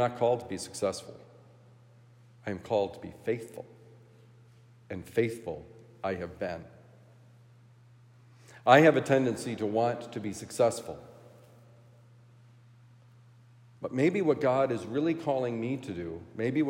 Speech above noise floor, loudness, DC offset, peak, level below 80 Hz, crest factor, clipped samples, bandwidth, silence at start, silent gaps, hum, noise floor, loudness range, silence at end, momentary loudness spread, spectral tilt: 28 dB; -29 LUFS; under 0.1%; -6 dBFS; -72 dBFS; 26 dB; under 0.1%; 16 kHz; 0 s; none; none; -57 dBFS; 11 LU; 0 s; 17 LU; -6 dB/octave